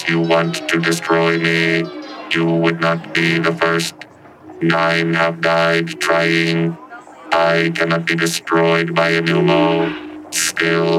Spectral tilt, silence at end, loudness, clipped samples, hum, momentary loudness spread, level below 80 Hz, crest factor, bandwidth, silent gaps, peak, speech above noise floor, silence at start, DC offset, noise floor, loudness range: -4.5 dB/octave; 0 s; -16 LUFS; under 0.1%; none; 7 LU; -62 dBFS; 14 dB; 15.5 kHz; none; -2 dBFS; 24 dB; 0 s; under 0.1%; -39 dBFS; 1 LU